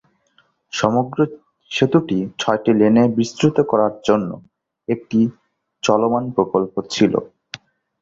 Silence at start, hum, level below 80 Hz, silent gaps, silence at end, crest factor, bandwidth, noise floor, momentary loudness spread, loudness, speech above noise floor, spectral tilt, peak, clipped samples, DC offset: 0.75 s; none; -56 dBFS; none; 0.75 s; 18 dB; 7.8 kHz; -60 dBFS; 13 LU; -18 LUFS; 43 dB; -6 dB/octave; 0 dBFS; under 0.1%; under 0.1%